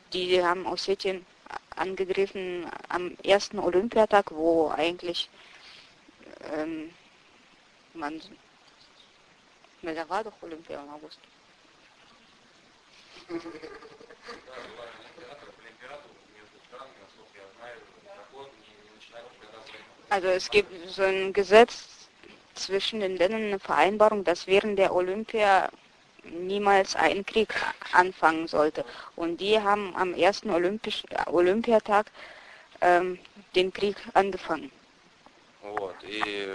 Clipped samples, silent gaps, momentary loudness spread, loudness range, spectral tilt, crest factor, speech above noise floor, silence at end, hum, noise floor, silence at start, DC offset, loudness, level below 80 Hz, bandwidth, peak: under 0.1%; none; 24 LU; 21 LU; -4 dB/octave; 26 dB; 33 dB; 0 s; none; -59 dBFS; 0.1 s; under 0.1%; -26 LUFS; -62 dBFS; 10.5 kHz; -2 dBFS